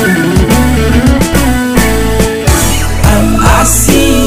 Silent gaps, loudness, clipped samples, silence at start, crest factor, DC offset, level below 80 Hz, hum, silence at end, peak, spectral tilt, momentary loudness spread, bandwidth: none; -8 LUFS; 1%; 0 s; 8 dB; 10%; -14 dBFS; none; 0 s; 0 dBFS; -4.5 dB/octave; 4 LU; 16.5 kHz